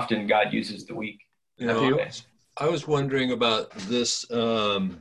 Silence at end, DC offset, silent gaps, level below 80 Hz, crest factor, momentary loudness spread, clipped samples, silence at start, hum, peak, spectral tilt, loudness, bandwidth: 0 s; under 0.1%; none; -60 dBFS; 18 dB; 12 LU; under 0.1%; 0 s; none; -8 dBFS; -4 dB/octave; -26 LUFS; 11.5 kHz